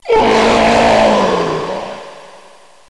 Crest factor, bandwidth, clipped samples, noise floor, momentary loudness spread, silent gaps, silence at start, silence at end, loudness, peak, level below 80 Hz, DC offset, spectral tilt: 10 dB; 11.5 kHz; under 0.1%; -43 dBFS; 15 LU; none; 0.05 s; 0.65 s; -11 LUFS; -2 dBFS; -36 dBFS; 0.5%; -4.5 dB/octave